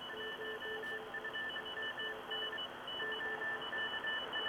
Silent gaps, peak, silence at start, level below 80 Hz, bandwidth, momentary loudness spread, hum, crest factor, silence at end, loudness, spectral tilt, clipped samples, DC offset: none; -28 dBFS; 0 s; -74 dBFS; over 20 kHz; 4 LU; none; 14 dB; 0 s; -40 LUFS; -2.5 dB/octave; under 0.1%; under 0.1%